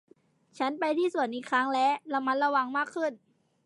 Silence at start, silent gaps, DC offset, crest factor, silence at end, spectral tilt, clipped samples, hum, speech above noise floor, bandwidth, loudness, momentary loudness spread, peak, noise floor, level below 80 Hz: 0.55 s; none; under 0.1%; 16 dB; 0.5 s; -3.5 dB/octave; under 0.1%; none; 33 dB; 11.5 kHz; -29 LUFS; 7 LU; -12 dBFS; -62 dBFS; -88 dBFS